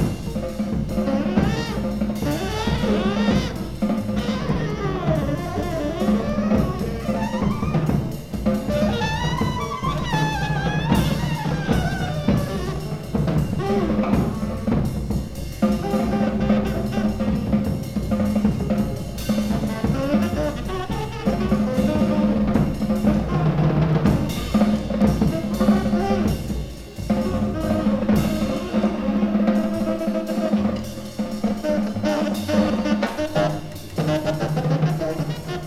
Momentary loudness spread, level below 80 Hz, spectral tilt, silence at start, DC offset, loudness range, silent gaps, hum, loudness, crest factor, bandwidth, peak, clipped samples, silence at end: 6 LU; -34 dBFS; -7 dB/octave; 0 s; under 0.1%; 3 LU; none; none; -22 LUFS; 16 dB; 15 kHz; -4 dBFS; under 0.1%; 0 s